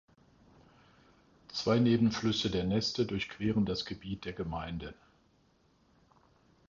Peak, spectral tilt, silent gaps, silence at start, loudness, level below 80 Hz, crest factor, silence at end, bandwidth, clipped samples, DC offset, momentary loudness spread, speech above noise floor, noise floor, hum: -14 dBFS; -6 dB/octave; none; 1.5 s; -32 LUFS; -56 dBFS; 20 dB; 1.75 s; 7.4 kHz; under 0.1%; under 0.1%; 13 LU; 37 dB; -69 dBFS; none